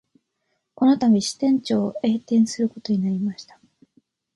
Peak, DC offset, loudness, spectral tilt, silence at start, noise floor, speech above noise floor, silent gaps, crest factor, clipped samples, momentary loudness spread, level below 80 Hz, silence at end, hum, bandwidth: -8 dBFS; under 0.1%; -21 LUFS; -6 dB/octave; 0.8 s; -74 dBFS; 54 dB; none; 14 dB; under 0.1%; 8 LU; -66 dBFS; 0.9 s; none; 11.5 kHz